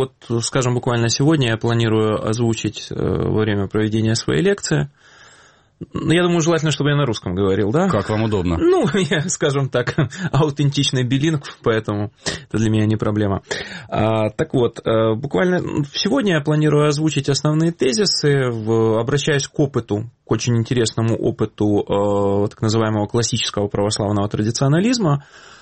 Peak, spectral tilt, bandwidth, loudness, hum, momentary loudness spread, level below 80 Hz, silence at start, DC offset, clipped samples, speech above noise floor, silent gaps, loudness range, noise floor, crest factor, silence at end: -4 dBFS; -5.5 dB/octave; 8.8 kHz; -19 LUFS; none; 6 LU; -46 dBFS; 0 s; under 0.1%; under 0.1%; 32 dB; none; 3 LU; -50 dBFS; 14 dB; 0.05 s